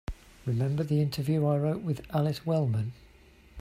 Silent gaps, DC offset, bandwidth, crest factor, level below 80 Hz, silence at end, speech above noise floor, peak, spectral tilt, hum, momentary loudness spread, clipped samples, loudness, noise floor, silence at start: none; under 0.1%; 15 kHz; 14 dB; -50 dBFS; 0 s; 28 dB; -16 dBFS; -8 dB/octave; none; 7 LU; under 0.1%; -29 LUFS; -56 dBFS; 0.1 s